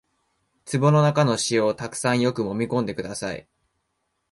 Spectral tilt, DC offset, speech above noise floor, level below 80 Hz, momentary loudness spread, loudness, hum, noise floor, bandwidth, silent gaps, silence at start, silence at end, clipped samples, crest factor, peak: -5.5 dB/octave; under 0.1%; 53 dB; -60 dBFS; 12 LU; -23 LUFS; none; -75 dBFS; 11.5 kHz; none; 0.65 s; 0.9 s; under 0.1%; 18 dB; -6 dBFS